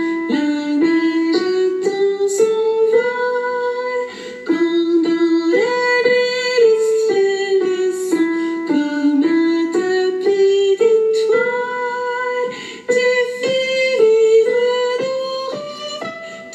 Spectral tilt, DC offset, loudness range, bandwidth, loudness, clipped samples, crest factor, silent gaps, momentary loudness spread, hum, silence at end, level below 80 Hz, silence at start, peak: -3.5 dB/octave; under 0.1%; 2 LU; 12 kHz; -17 LUFS; under 0.1%; 14 dB; none; 9 LU; none; 0 s; -68 dBFS; 0 s; -2 dBFS